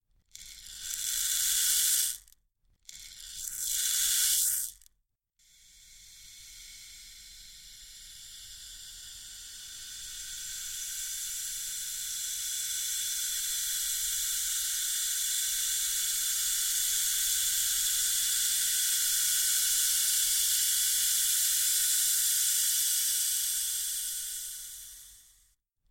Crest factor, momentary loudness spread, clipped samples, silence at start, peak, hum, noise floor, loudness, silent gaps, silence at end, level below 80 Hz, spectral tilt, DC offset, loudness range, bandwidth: 22 dB; 21 LU; under 0.1%; 0.35 s; -10 dBFS; none; -77 dBFS; -27 LUFS; none; 0.75 s; -60 dBFS; 4.5 dB/octave; under 0.1%; 18 LU; 17 kHz